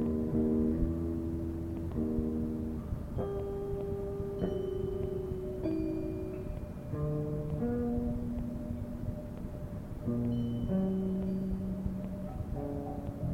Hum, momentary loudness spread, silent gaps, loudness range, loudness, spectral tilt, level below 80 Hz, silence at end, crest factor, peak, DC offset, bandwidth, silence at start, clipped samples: none; 8 LU; none; 2 LU; -36 LUFS; -10 dB/octave; -44 dBFS; 0 s; 16 dB; -18 dBFS; under 0.1%; 16 kHz; 0 s; under 0.1%